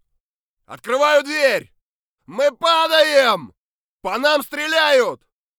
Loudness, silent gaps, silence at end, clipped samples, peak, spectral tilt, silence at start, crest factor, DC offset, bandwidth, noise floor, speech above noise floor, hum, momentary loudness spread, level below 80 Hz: -17 LUFS; 1.81-2.18 s, 3.57-4.00 s; 0.45 s; under 0.1%; -2 dBFS; -2 dB/octave; 0.7 s; 18 dB; under 0.1%; over 20 kHz; -78 dBFS; 60 dB; none; 11 LU; -64 dBFS